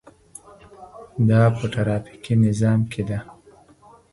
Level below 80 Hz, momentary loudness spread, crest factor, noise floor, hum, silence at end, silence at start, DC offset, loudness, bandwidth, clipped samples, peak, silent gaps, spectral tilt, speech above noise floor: -50 dBFS; 22 LU; 16 dB; -51 dBFS; none; 0.8 s; 0.8 s; under 0.1%; -21 LUFS; 11.5 kHz; under 0.1%; -6 dBFS; none; -8 dB/octave; 32 dB